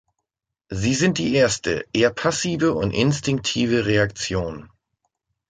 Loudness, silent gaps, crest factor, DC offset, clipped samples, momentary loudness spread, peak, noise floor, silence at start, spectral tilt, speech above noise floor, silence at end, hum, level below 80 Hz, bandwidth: -21 LUFS; none; 18 dB; under 0.1%; under 0.1%; 7 LU; -4 dBFS; -82 dBFS; 0.7 s; -4.5 dB/octave; 62 dB; 0.85 s; none; -46 dBFS; 9.6 kHz